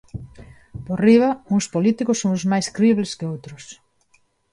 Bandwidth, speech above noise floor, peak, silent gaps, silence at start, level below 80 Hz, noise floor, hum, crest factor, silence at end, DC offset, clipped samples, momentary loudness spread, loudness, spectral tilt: 11.5 kHz; 43 dB; -4 dBFS; none; 0.15 s; -52 dBFS; -62 dBFS; none; 18 dB; 0.8 s; under 0.1%; under 0.1%; 23 LU; -19 LUFS; -6 dB/octave